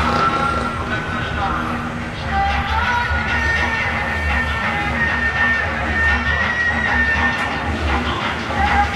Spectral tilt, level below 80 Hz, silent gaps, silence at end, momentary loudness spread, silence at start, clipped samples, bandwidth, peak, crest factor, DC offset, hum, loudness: -5 dB/octave; -28 dBFS; none; 0 s; 6 LU; 0 s; under 0.1%; 12 kHz; -4 dBFS; 14 dB; under 0.1%; none; -18 LUFS